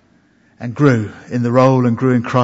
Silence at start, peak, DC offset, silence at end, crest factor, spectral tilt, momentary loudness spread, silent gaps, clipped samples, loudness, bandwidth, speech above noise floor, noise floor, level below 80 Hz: 0.6 s; 0 dBFS; under 0.1%; 0 s; 16 dB; -8 dB/octave; 13 LU; none; under 0.1%; -15 LUFS; 7.8 kHz; 40 dB; -54 dBFS; -56 dBFS